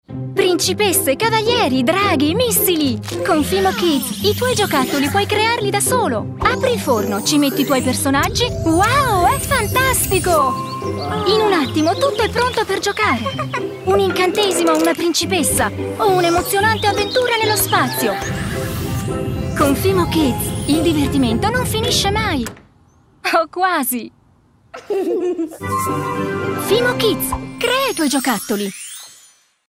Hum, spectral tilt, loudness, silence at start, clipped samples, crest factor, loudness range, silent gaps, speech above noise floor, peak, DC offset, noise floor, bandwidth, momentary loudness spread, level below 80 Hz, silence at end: none; -4 dB/octave; -17 LUFS; 0.1 s; under 0.1%; 18 dB; 4 LU; none; 36 dB; 0 dBFS; under 0.1%; -53 dBFS; 16.5 kHz; 8 LU; -38 dBFS; 0.55 s